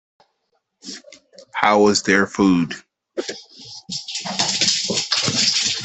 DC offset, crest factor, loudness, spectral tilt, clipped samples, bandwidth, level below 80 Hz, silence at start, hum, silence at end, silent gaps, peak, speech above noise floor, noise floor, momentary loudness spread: under 0.1%; 20 dB; -18 LUFS; -2.5 dB/octave; under 0.1%; 8.6 kHz; -58 dBFS; 0.85 s; none; 0 s; none; 0 dBFS; 53 dB; -71 dBFS; 20 LU